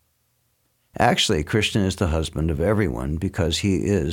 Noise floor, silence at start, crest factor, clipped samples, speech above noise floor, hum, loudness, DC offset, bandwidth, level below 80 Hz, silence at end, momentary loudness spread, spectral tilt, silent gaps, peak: -68 dBFS; 0.95 s; 18 dB; under 0.1%; 47 dB; none; -22 LUFS; under 0.1%; 17 kHz; -36 dBFS; 0 s; 5 LU; -5 dB/octave; none; -4 dBFS